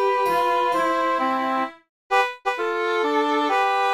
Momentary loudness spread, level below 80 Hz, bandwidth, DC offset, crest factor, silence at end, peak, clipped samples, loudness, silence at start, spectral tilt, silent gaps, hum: 4 LU; -68 dBFS; 16 kHz; under 0.1%; 14 dB; 0 s; -8 dBFS; under 0.1%; -22 LUFS; 0 s; -3 dB/octave; 1.89-2.10 s; none